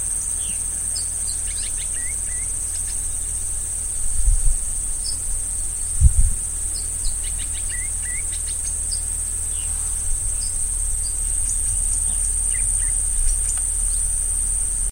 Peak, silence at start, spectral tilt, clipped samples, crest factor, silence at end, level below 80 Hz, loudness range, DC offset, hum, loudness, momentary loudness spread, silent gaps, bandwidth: 0 dBFS; 0 s; -1.5 dB/octave; under 0.1%; 22 dB; 0 s; -26 dBFS; 3 LU; under 0.1%; none; -21 LUFS; 4 LU; none; 16.5 kHz